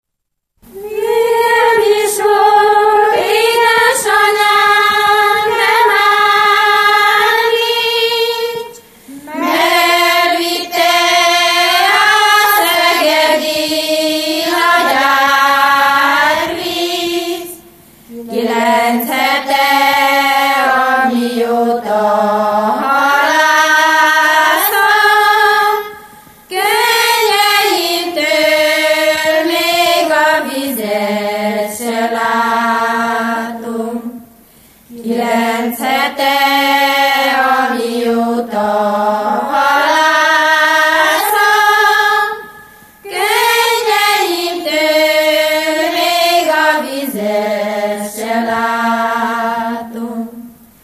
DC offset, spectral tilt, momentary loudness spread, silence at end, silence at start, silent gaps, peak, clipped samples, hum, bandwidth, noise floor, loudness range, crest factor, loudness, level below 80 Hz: under 0.1%; -1.5 dB/octave; 9 LU; 0.3 s; 0.75 s; none; 0 dBFS; under 0.1%; none; 15 kHz; -74 dBFS; 6 LU; 12 dB; -11 LUFS; -56 dBFS